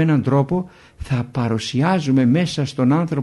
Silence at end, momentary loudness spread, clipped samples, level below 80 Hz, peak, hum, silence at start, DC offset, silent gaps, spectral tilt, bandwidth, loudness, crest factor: 0 s; 8 LU; under 0.1%; -44 dBFS; -6 dBFS; none; 0 s; under 0.1%; none; -7 dB/octave; 11.5 kHz; -19 LUFS; 12 dB